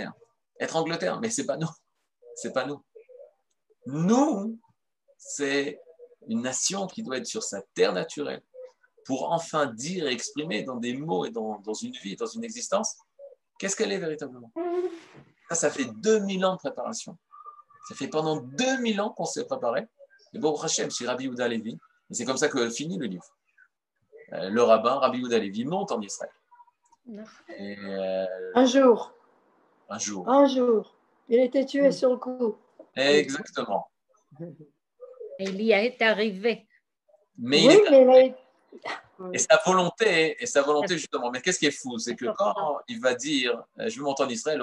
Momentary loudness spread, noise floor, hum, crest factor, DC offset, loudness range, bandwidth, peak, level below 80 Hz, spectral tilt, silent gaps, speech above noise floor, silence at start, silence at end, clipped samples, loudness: 17 LU; -71 dBFS; none; 22 dB; under 0.1%; 10 LU; 11.5 kHz; -4 dBFS; -80 dBFS; -3.5 dB/octave; none; 45 dB; 0 s; 0 s; under 0.1%; -26 LUFS